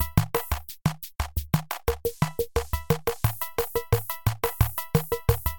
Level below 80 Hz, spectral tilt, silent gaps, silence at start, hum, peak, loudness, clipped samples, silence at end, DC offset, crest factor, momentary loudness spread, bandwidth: -36 dBFS; -5.5 dB/octave; none; 0 s; none; -4 dBFS; -28 LUFS; under 0.1%; 0 s; 0.8%; 22 dB; 5 LU; 17.5 kHz